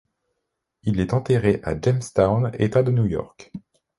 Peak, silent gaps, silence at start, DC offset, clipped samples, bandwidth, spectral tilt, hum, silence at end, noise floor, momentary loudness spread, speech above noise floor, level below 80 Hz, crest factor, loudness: -4 dBFS; none; 0.85 s; under 0.1%; under 0.1%; 11.5 kHz; -8 dB/octave; none; 0.4 s; -79 dBFS; 19 LU; 58 dB; -44 dBFS; 18 dB; -22 LUFS